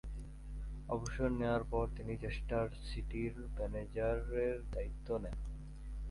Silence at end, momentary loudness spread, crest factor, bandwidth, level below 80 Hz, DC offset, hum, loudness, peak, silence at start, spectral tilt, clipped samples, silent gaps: 0 s; 12 LU; 16 dB; 11.5 kHz; -44 dBFS; under 0.1%; none; -41 LUFS; -22 dBFS; 0.05 s; -7 dB/octave; under 0.1%; none